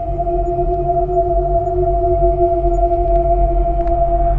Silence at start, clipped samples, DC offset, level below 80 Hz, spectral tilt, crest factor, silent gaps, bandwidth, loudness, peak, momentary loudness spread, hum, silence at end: 0 s; under 0.1%; under 0.1%; -20 dBFS; -11.5 dB/octave; 14 dB; none; 2.7 kHz; -16 LUFS; -2 dBFS; 3 LU; none; 0 s